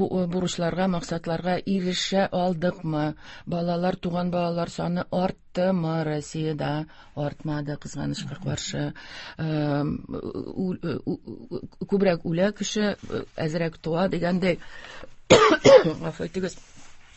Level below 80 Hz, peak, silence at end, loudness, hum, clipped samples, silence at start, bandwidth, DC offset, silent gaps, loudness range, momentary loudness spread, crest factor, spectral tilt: -50 dBFS; 0 dBFS; 0.1 s; -25 LUFS; none; under 0.1%; 0 s; 8.4 kHz; under 0.1%; none; 9 LU; 11 LU; 26 dB; -5.5 dB/octave